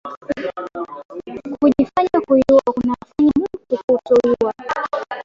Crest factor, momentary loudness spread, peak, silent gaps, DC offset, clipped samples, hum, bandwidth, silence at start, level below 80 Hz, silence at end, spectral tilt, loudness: 14 dB; 16 LU; -2 dBFS; 0.17-0.21 s, 1.05-1.09 s, 3.84-3.88 s; under 0.1%; under 0.1%; none; 7.6 kHz; 0.05 s; -48 dBFS; 0 s; -7 dB/octave; -18 LUFS